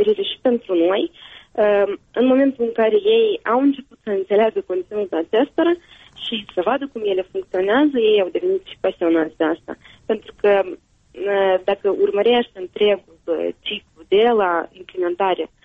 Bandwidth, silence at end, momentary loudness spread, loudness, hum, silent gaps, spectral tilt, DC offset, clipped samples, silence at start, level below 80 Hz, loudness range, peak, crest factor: 4.5 kHz; 0.2 s; 10 LU; -19 LUFS; none; none; -6.5 dB/octave; under 0.1%; under 0.1%; 0 s; -60 dBFS; 3 LU; -6 dBFS; 14 dB